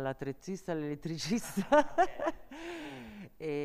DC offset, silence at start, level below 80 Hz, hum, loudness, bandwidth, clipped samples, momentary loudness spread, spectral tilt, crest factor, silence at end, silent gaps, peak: under 0.1%; 0 s; -58 dBFS; none; -34 LUFS; 15 kHz; under 0.1%; 17 LU; -5 dB/octave; 20 dB; 0 s; none; -12 dBFS